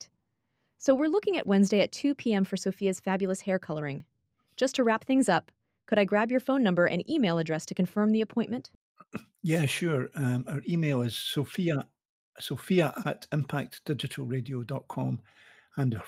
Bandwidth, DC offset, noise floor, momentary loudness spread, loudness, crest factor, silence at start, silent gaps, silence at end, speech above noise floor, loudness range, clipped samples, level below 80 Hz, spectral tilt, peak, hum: 16 kHz; under 0.1%; -78 dBFS; 11 LU; -29 LUFS; 18 dB; 0 s; 8.75-8.95 s, 12.05-12.33 s; 0 s; 50 dB; 5 LU; under 0.1%; -70 dBFS; -6 dB/octave; -10 dBFS; none